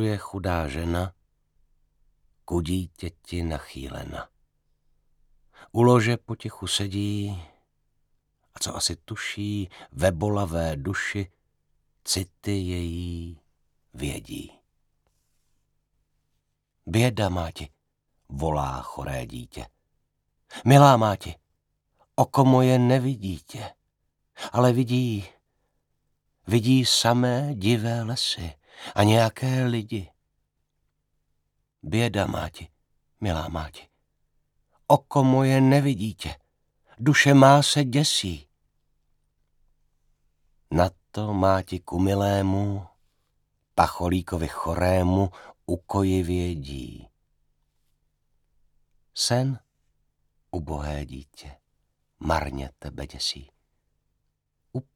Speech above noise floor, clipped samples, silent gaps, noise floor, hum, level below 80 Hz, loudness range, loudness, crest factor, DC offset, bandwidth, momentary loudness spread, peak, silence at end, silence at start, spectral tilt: 52 dB; under 0.1%; none; -75 dBFS; 50 Hz at -55 dBFS; -46 dBFS; 12 LU; -24 LUFS; 24 dB; under 0.1%; 16.5 kHz; 19 LU; -2 dBFS; 0.15 s; 0 s; -5.5 dB/octave